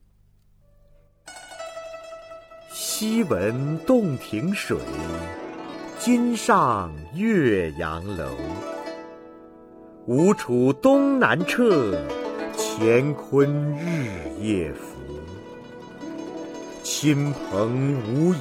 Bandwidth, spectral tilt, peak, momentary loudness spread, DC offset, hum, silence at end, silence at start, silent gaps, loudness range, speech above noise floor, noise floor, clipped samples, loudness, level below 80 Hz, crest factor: 16.5 kHz; -5.5 dB/octave; -4 dBFS; 19 LU; under 0.1%; 50 Hz at -55 dBFS; 0 s; 1.25 s; none; 7 LU; 36 dB; -58 dBFS; under 0.1%; -23 LUFS; -50 dBFS; 20 dB